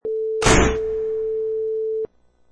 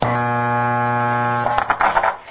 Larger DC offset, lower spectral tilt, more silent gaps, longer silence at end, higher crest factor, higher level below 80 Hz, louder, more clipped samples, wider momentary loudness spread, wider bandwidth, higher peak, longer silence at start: neither; second, -4 dB/octave vs -10 dB/octave; neither; first, 0.45 s vs 0 s; about the same, 20 dB vs 18 dB; first, -32 dBFS vs -46 dBFS; second, -21 LUFS vs -18 LUFS; neither; first, 10 LU vs 2 LU; first, 11 kHz vs 4 kHz; about the same, -2 dBFS vs 0 dBFS; about the same, 0.05 s vs 0 s